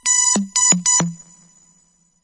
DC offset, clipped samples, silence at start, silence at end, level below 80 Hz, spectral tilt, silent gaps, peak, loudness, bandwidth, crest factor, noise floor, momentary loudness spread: under 0.1%; under 0.1%; 0.05 s; 1.1 s; -60 dBFS; -1.5 dB/octave; none; -2 dBFS; -14 LUFS; 11.5 kHz; 18 dB; -59 dBFS; 4 LU